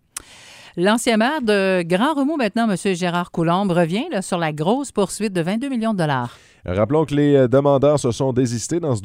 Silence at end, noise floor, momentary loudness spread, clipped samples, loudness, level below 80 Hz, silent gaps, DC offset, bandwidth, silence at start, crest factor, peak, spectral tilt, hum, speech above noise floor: 0 s; -43 dBFS; 7 LU; under 0.1%; -19 LUFS; -52 dBFS; none; under 0.1%; 16 kHz; 0.45 s; 16 dB; -4 dBFS; -5.5 dB/octave; none; 25 dB